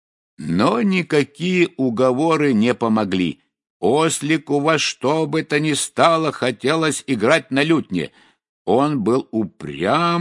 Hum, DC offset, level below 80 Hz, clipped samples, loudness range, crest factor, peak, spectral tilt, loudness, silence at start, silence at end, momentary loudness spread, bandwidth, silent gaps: none; under 0.1%; -62 dBFS; under 0.1%; 1 LU; 18 dB; 0 dBFS; -5 dB/octave; -19 LUFS; 0.4 s; 0 s; 8 LU; 11.5 kHz; 3.70-3.80 s, 8.49-8.65 s